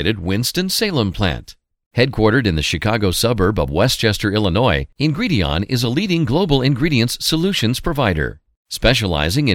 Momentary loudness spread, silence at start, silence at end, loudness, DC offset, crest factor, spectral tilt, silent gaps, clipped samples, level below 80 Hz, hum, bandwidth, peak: 4 LU; 0 s; 0 s; -17 LUFS; under 0.1%; 18 dB; -5 dB/octave; 1.86-1.91 s, 8.57-8.65 s; under 0.1%; -32 dBFS; none; 17 kHz; 0 dBFS